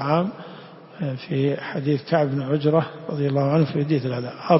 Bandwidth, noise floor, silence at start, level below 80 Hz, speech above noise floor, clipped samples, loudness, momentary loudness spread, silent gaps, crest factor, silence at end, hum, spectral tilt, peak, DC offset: 5.8 kHz; -42 dBFS; 0 s; -62 dBFS; 20 dB; under 0.1%; -23 LUFS; 11 LU; none; 18 dB; 0 s; none; -11.5 dB/octave; -4 dBFS; under 0.1%